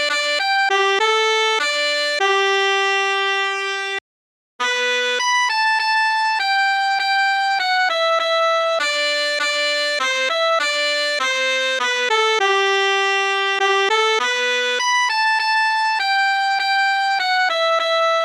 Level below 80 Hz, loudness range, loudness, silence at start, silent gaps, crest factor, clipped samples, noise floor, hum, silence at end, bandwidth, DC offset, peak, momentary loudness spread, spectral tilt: -90 dBFS; 2 LU; -17 LUFS; 0 s; 4.01-4.59 s; 14 dB; under 0.1%; under -90 dBFS; none; 0 s; 16 kHz; under 0.1%; -6 dBFS; 2 LU; 2.5 dB/octave